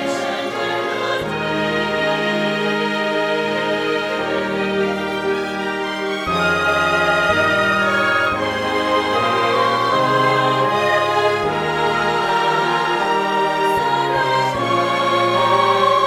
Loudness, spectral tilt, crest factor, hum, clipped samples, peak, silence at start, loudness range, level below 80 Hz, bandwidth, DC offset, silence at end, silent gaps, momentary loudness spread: -18 LUFS; -4.5 dB/octave; 14 dB; none; under 0.1%; -4 dBFS; 0 s; 3 LU; -50 dBFS; 16.5 kHz; under 0.1%; 0 s; none; 6 LU